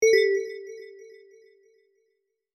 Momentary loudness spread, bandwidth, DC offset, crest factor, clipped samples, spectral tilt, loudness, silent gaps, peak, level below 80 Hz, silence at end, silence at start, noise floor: 26 LU; 13 kHz; under 0.1%; 18 dB; under 0.1%; -0.5 dB/octave; -24 LUFS; none; -8 dBFS; -78 dBFS; 1.5 s; 0 s; -76 dBFS